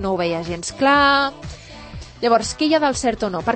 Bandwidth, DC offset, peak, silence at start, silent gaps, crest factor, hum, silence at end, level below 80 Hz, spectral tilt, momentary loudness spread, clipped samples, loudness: 8.8 kHz; under 0.1%; -4 dBFS; 0 s; none; 16 dB; none; 0 s; -42 dBFS; -4 dB/octave; 22 LU; under 0.1%; -18 LUFS